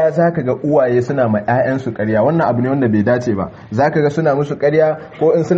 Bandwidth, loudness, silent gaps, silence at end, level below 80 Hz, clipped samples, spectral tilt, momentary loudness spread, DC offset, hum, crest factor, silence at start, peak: 7.8 kHz; -15 LUFS; none; 0 s; -50 dBFS; under 0.1%; -8.5 dB/octave; 4 LU; under 0.1%; none; 12 dB; 0 s; -2 dBFS